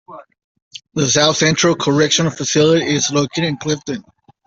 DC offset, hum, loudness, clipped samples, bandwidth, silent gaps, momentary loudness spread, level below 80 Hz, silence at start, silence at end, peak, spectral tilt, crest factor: under 0.1%; none; -15 LUFS; under 0.1%; 8 kHz; 0.44-0.55 s, 0.62-0.71 s; 9 LU; -54 dBFS; 0.1 s; 0.45 s; -2 dBFS; -3.5 dB/octave; 16 dB